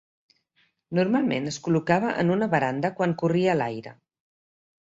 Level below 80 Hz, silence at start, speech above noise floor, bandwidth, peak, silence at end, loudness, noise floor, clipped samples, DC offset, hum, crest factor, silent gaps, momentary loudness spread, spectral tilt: -64 dBFS; 0.9 s; 45 dB; 7.8 kHz; -6 dBFS; 0.95 s; -24 LUFS; -69 dBFS; under 0.1%; under 0.1%; none; 20 dB; none; 6 LU; -6.5 dB/octave